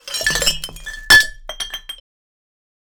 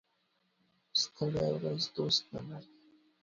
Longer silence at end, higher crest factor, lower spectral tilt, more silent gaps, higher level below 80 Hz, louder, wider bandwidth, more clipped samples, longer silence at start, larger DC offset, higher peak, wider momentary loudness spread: first, 1.05 s vs 0.6 s; about the same, 20 dB vs 22 dB; second, 0 dB/octave vs -4.5 dB/octave; neither; first, -38 dBFS vs -66 dBFS; first, -13 LUFS vs -33 LUFS; first, over 20 kHz vs 7.4 kHz; neither; second, 0.05 s vs 0.95 s; neither; first, 0 dBFS vs -16 dBFS; first, 22 LU vs 14 LU